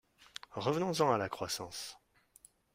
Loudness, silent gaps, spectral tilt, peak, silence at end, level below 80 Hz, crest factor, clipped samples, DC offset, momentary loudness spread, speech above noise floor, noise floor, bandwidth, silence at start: -35 LUFS; none; -4.5 dB/octave; -16 dBFS; 0.8 s; -72 dBFS; 22 dB; under 0.1%; under 0.1%; 17 LU; 30 dB; -64 dBFS; 16 kHz; 0.5 s